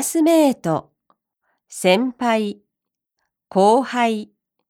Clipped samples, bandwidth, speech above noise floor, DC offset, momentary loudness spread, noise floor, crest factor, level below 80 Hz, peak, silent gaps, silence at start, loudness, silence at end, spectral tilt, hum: under 0.1%; 17.5 kHz; 66 dB; under 0.1%; 11 LU; -83 dBFS; 18 dB; -70 dBFS; -2 dBFS; none; 0 s; -19 LUFS; 0.45 s; -4.5 dB/octave; none